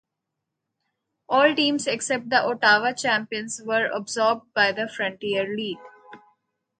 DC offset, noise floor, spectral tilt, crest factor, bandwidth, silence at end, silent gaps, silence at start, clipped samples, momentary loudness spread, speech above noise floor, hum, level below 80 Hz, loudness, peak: under 0.1%; -83 dBFS; -2.5 dB/octave; 20 dB; 9.6 kHz; 0.6 s; none; 1.3 s; under 0.1%; 10 LU; 60 dB; none; -74 dBFS; -23 LUFS; -4 dBFS